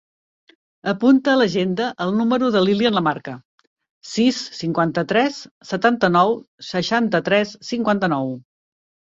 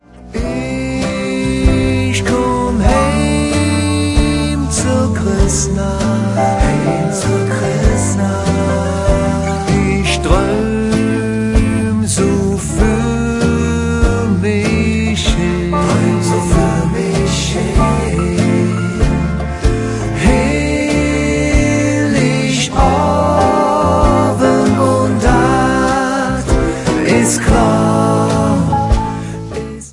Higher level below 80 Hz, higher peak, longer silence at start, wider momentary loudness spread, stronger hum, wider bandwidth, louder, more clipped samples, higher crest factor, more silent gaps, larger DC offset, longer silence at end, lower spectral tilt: second, -60 dBFS vs -22 dBFS; about the same, -2 dBFS vs 0 dBFS; first, 0.85 s vs 0.15 s; first, 12 LU vs 4 LU; neither; second, 7.8 kHz vs 11.5 kHz; second, -19 LUFS vs -14 LUFS; neither; first, 18 dB vs 12 dB; first, 3.45-3.58 s, 3.67-3.77 s, 3.91-4.01 s, 5.51-5.61 s, 6.48-6.58 s vs none; neither; first, 0.7 s vs 0 s; about the same, -5.5 dB/octave vs -5.5 dB/octave